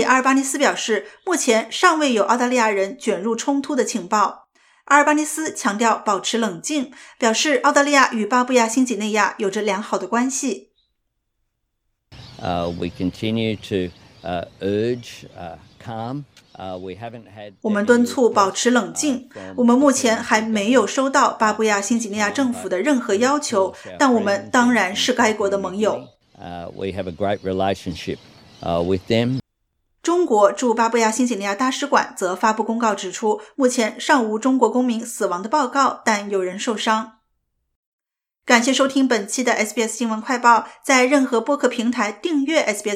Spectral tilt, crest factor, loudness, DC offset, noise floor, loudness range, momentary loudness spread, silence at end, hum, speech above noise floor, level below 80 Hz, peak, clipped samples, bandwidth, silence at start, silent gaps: -3.5 dB/octave; 20 dB; -19 LUFS; under 0.1%; -73 dBFS; 8 LU; 13 LU; 0 s; none; 54 dB; -58 dBFS; 0 dBFS; under 0.1%; 15.5 kHz; 0 s; 37.76-37.99 s